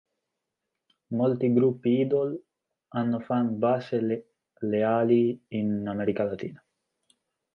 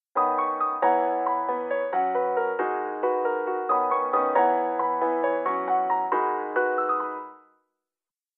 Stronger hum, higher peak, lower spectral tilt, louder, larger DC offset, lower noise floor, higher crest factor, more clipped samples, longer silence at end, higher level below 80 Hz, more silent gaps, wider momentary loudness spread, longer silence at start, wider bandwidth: neither; about the same, -10 dBFS vs -8 dBFS; first, -10 dB/octave vs -3 dB/octave; about the same, -27 LUFS vs -25 LUFS; neither; second, -84 dBFS vs under -90 dBFS; about the same, 18 dB vs 16 dB; neither; about the same, 1 s vs 1 s; first, -68 dBFS vs under -90 dBFS; neither; first, 11 LU vs 5 LU; first, 1.1 s vs 0.15 s; first, 5.6 kHz vs 4 kHz